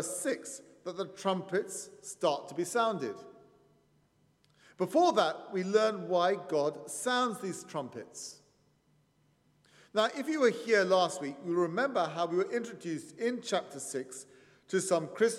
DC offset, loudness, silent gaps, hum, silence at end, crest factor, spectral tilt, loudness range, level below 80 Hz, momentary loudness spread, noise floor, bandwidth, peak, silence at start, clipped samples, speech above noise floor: under 0.1%; -32 LUFS; none; none; 0 s; 18 dB; -4 dB/octave; 6 LU; -84 dBFS; 14 LU; -70 dBFS; 15 kHz; -14 dBFS; 0 s; under 0.1%; 38 dB